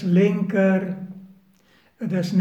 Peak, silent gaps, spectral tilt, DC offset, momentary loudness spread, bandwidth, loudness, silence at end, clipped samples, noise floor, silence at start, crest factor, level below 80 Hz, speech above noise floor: -6 dBFS; none; -8.5 dB/octave; under 0.1%; 18 LU; 8.2 kHz; -22 LUFS; 0 s; under 0.1%; -58 dBFS; 0 s; 16 dB; -72 dBFS; 39 dB